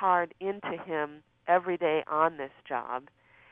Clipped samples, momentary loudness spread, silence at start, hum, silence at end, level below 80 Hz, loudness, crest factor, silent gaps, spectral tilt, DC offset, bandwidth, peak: under 0.1%; 12 LU; 0 s; none; 0.5 s; -74 dBFS; -30 LUFS; 20 dB; none; -8 dB/octave; under 0.1%; 3.8 kHz; -10 dBFS